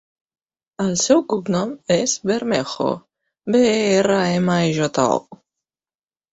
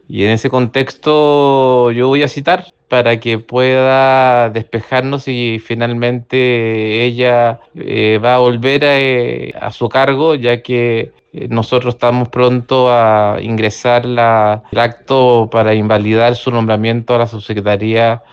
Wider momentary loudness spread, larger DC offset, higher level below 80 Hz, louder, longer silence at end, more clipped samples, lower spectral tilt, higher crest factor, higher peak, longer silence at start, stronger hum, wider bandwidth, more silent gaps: about the same, 8 LU vs 7 LU; neither; second, -58 dBFS vs -50 dBFS; second, -19 LUFS vs -12 LUFS; first, 1 s vs 0.15 s; neither; second, -4.5 dB/octave vs -7 dB/octave; first, 18 dB vs 12 dB; about the same, -2 dBFS vs 0 dBFS; first, 0.8 s vs 0.1 s; neither; about the same, 8.2 kHz vs 7.8 kHz; neither